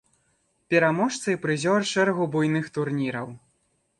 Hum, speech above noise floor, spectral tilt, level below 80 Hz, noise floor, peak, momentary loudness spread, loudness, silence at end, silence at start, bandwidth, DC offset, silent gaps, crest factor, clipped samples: none; 46 dB; -5 dB/octave; -68 dBFS; -70 dBFS; -6 dBFS; 7 LU; -24 LUFS; 0.6 s; 0.7 s; 11.5 kHz; under 0.1%; none; 18 dB; under 0.1%